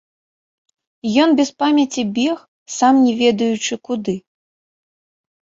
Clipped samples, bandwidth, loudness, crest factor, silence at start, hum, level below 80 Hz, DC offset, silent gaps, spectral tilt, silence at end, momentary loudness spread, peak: under 0.1%; 7.8 kHz; -17 LUFS; 18 dB; 1.05 s; none; -62 dBFS; under 0.1%; 2.48-2.66 s; -4 dB/octave; 1.4 s; 13 LU; -2 dBFS